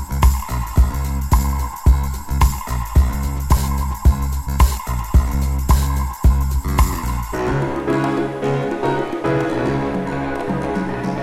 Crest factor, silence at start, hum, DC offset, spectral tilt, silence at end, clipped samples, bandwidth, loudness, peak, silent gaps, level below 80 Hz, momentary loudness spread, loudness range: 16 dB; 0 s; none; under 0.1%; -6.5 dB/octave; 0 s; under 0.1%; 16 kHz; -20 LUFS; -2 dBFS; none; -20 dBFS; 5 LU; 2 LU